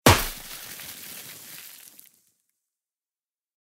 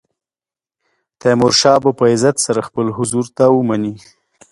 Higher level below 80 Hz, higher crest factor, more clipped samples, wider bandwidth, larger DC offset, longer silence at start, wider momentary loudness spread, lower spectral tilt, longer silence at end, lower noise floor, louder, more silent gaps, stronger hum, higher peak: first, -44 dBFS vs -54 dBFS; first, 28 dB vs 16 dB; neither; first, 16 kHz vs 11.5 kHz; neither; second, 0.05 s vs 1.25 s; first, 21 LU vs 9 LU; about the same, -3.5 dB/octave vs -4.5 dB/octave; first, 2.15 s vs 0.55 s; about the same, under -90 dBFS vs under -90 dBFS; second, -28 LUFS vs -14 LUFS; neither; neither; about the same, -2 dBFS vs 0 dBFS